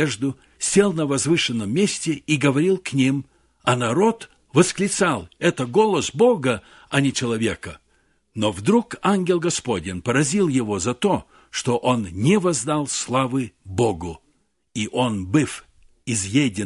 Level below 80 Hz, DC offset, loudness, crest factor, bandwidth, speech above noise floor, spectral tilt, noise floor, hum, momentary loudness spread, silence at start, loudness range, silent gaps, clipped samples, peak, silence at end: -50 dBFS; under 0.1%; -21 LUFS; 20 dB; 11.5 kHz; 45 dB; -4.5 dB/octave; -66 dBFS; none; 9 LU; 0 s; 3 LU; none; under 0.1%; -2 dBFS; 0 s